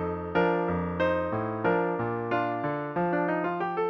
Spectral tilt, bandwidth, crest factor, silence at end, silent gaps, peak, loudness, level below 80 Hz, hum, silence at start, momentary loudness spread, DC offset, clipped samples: -9 dB/octave; 6 kHz; 16 dB; 0 s; none; -12 dBFS; -28 LUFS; -54 dBFS; none; 0 s; 4 LU; under 0.1%; under 0.1%